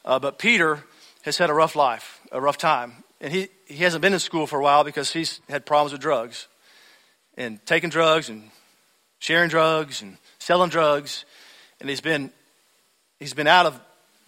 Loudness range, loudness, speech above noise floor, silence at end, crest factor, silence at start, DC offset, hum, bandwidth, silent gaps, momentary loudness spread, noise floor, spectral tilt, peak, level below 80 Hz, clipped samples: 3 LU; -21 LUFS; 43 dB; 0.5 s; 20 dB; 0.05 s; under 0.1%; none; 16 kHz; none; 17 LU; -65 dBFS; -3.5 dB/octave; -2 dBFS; -68 dBFS; under 0.1%